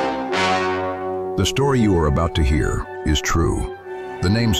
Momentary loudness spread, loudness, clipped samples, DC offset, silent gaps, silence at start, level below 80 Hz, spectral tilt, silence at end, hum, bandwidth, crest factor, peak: 8 LU; -20 LUFS; under 0.1%; under 0.1%; none; 0 s; -30 dBFS; -5.5 dB/octave; 0 s; none; 15 kHz; 12 dB; -8 dBFS